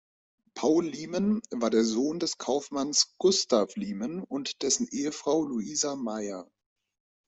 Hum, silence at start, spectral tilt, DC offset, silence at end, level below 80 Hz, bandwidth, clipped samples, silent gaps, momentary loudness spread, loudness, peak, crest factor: none; 0.55 s; -3.5 dB/octave; under 0.1%; 0.85 s; -70 dBFS; 8.4 kHz; under 0.1%; none; 9 LU; -28 LUFS; -10 dBFS; 20 dB